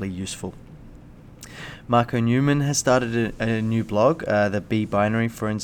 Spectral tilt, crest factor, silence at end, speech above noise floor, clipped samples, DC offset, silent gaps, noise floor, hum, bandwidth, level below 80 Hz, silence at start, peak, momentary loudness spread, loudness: -5.5 dB/octave; 18 dB; 0 s; 23 dB; under 0.1%; under 0.1%; none; -44 dBFS; none; 18.5 kHz; -48 dBFS; 0 s; -6 dBFS; 15 LU; -22 LUFS